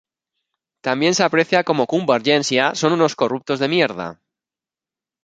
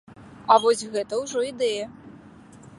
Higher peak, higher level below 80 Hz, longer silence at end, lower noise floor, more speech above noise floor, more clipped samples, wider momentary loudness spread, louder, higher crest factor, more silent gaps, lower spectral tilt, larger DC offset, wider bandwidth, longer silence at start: about the same, -2 dBFS vs -2 dBFS; about the same, -64 dBFS vs -64 dBFS; first, 1.1 s vs 0.25 s; first, -90 dBFS vs -47 dBFS; first, 72 dB vs 25 dB; neither; second, 7 LU vs 15 LU; first, -18 LUFS vs -23 LUFS; second, 18 dB vs 24 dB; neither; about the same, -4 dB/octave vs -3 dB/octave; neither; second, 9.4 kHz vs 11.5 kHz; first, 0.85 s vs 0.1 s